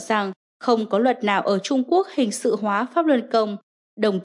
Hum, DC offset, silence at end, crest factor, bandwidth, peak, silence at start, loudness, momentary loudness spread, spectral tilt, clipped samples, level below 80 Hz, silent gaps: none; under 0.1%; 0 s; 16 dB; 11.5 kHz; -6 dBFS; 0 s; -22 LUFS; 6 LU; -5 dB/octave; under 0.1%; -82 dBFS; 0.36-0.60 s, 3.63-3.97 s